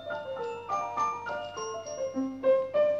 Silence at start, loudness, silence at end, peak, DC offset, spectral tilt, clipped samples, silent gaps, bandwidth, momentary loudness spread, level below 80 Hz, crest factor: 0 s; -31 LUFS; 0 s; -16 dBFS; under 0.1%; -4.5 dB/octave; under 0.1%; none; 7.6 kHz; 10 LU; -70 dBFS; 14 dB